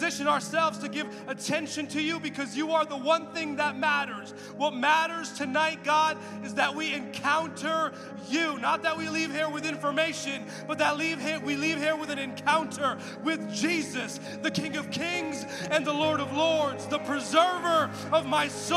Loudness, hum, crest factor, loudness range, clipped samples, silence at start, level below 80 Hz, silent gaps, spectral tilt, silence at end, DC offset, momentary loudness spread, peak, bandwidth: -28 LUFS; none; 20 dB; 3 LU; under 0.1%; 0 s; -76 dBFS; none; -3.5 dB/octave; 0 s; under 0.1%; 8 LU; -10 dBFS; 14.5 kHz